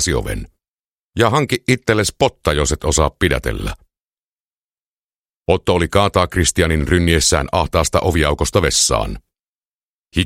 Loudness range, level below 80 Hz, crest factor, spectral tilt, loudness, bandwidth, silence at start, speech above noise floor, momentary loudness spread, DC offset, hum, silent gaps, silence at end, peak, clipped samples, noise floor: 5 LU; -28 dBFS; 18 dB; -4 dB/octave; -16 LUFS; 16 kHz; 0 s; over 74 dB; 11 LU; under 0.1%; none; 0.68-0.77 s, 0.91-1.11 s, 4.01-4.10 s, 4.18-4.72 s, 4.79-5.10 s, 5.16-5.42 s, 9.48-10.05 s; 0 s; 0 dBFS; under 0.1%; under -90 dBFS